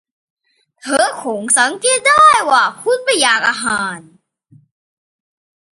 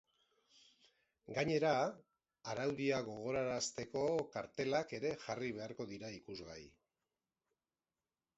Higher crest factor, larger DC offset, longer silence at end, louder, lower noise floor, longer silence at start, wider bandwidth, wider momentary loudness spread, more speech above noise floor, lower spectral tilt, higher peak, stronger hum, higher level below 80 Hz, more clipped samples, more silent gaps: second, 16 dB vs 22 dB; neither; about the same, 1.75 s vs 1.7 s; first, -13 LUFS vs -40 LUFS; second, -50 dBFS vs under -90 dBFS; second, 0.85 s vs 1.3 s; first, 11.5 kHz vs 7.6 kHz; about the same, 13 LU vs 15 LU; second, 36 dB vs over 50 dB; second, -0.5 dB/octave vs -4 dB/octave; first, 0 dBFS vs -20 dBFS; neither; first, -58 dBFS vs -74 dBFS; neither; neither